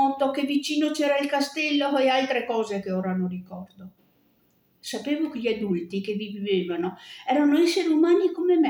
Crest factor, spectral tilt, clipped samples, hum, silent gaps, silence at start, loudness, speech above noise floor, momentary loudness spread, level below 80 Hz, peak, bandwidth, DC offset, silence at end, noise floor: 14 dB; -5 dB/octave; under 0.1%; none; none; 0 s; -24 LUFS; 41 dB; 12 LU; -70 dBFS; -10 dBFS; 19 kHz; under 0.1%; 0 s; -65 dBFS